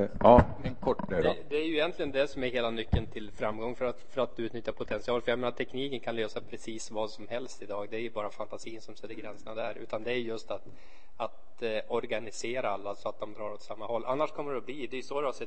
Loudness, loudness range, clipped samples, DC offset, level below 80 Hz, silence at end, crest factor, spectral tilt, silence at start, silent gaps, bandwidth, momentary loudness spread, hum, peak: -32 LUFS; 7 LU; under 0.1%; 1%; -46 dBFS; 0 s; 28 dB; -6 dB/octave; 0 s; none; 8.8 kHz; 11 LU; none; -4 dBFS